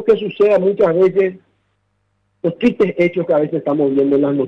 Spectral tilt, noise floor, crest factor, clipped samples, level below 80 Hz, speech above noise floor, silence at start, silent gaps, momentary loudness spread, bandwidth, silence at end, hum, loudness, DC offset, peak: -8.5 dB/octave; -66 dBFS; 12 dB; under 0.1%; -56 dBFS; 51 dB; 0 s; none; 5 LU; 6.2 kHz; 0 s; 50 Hz at -60 dBFS; -16 LUFS; under 0.1%; -4 dBFS